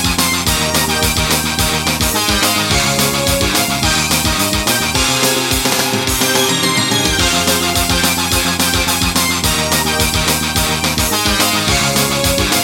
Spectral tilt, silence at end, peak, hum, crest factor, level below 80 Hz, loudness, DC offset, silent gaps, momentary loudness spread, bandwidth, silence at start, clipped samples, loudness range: -2.5 dB/octave; 0 s; 0 dBFS; none; 14 dB; -28 dBFS; -13 LUFS; under 0.1%; none; 2 LU; 17 kHz; 0 s; under 0.1%; 1 LU